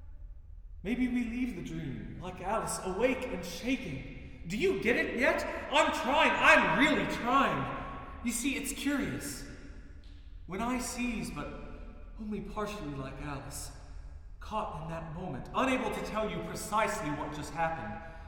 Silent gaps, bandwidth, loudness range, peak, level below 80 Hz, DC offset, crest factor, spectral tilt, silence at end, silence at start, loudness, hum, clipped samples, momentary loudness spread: none; 19.5 kHz; 13 LU; -8 dBFS; -48 dBFS; under 0.1%; 24 dB; -4 dB/octave; 0 s; 0 s; -32 LUFS; none; under 0.1%; 19 LU